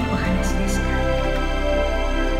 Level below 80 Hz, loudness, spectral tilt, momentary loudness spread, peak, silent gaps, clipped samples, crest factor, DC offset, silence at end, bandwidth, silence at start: -24 dBFS; -22 LUFS; -5.5 dB/octave; 1 LU; -10 dBFS; none; under 0.1%; 10 dB; under 0.1%; 0 s; 14.5 kHz; 0 s